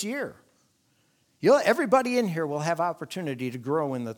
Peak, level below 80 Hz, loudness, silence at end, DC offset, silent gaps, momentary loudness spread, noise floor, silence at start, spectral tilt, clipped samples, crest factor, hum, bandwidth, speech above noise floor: -8 dBFS; -76 dBFS; -26 LUFS; 0.05 s; under 0.1%; none; 12 LU; -68 dBFS; 0 s; -5.5 dB/octave; under 0.1%; 20 dB; none; 19 kHz; 42 dB